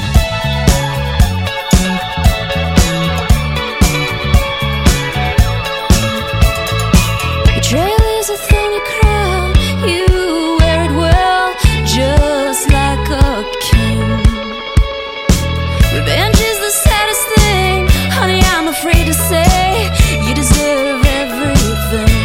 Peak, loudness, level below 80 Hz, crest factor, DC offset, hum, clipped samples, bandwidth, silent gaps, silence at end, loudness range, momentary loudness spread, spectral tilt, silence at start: 0 dBFS; -13 LUFS; -16 dBFS; 12 dB; 0.1%; none; under 0.1%; 17 kHz; none; 0 s; 2 LU; 4 LU; -4.5 dB/octave; 0 s